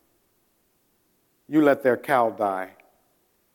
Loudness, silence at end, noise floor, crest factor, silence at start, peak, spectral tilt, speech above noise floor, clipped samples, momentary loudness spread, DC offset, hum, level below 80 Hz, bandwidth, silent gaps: -22 LUFS; 0.85 s; -68 dBFS; 20 dB; 1.5 s; -6 dBFS; -6.5 dB/octave; 46 dB; under 0.1%; 11 LU; under 0.1%; none; -76 dBFS; 17.5 kHz; none